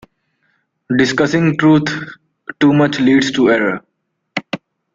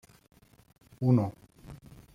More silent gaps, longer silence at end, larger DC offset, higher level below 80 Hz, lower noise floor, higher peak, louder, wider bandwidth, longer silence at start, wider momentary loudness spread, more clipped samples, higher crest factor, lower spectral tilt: neither; about the same, 0.35 s vs 0.4 s; neither; first, -52 dBFS vs -62 dBFS; first, -64 dBFS vs -50 dBFS; first, 0 dBFS vs -12 dBFS; first, -14 LUFS vs -28 LUFS; second, 7.6 kHz vs 10.5 kHz; about the same, 0.9 s vs 1 s; second, 16 LU vs 25 LU; neither; about the same, 16 dB vs 20 dB; second, -6 dB/octave vs -10 dB/octave